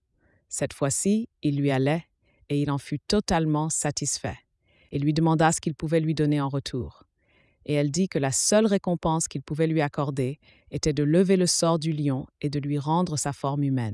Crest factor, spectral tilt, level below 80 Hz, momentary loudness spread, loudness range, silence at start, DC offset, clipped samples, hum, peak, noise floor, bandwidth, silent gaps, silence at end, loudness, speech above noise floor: 18 dB; -5 dB/octave; -52 dBFS; 10 LU; 2 LU; 0.5 s; under 0.1%; under 0.1%; none; -8 dBFS; -67 dBFS; 12 kHz; none; 0 s; -25 LUFS; 42 dB